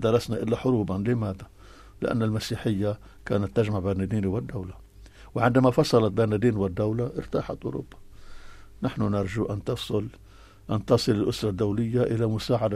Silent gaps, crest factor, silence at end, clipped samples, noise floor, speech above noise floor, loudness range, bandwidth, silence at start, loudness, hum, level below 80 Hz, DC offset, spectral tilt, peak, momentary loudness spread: none; 18 dB; 0 s; under 0.1%; -48 dBFS; 23 dB; 6 LU; 14 kHz; 0 s; -26 LUFS; none; -48 dBFS; under 0.1%; -7 dB/octave; -8 dBFS; 11 LU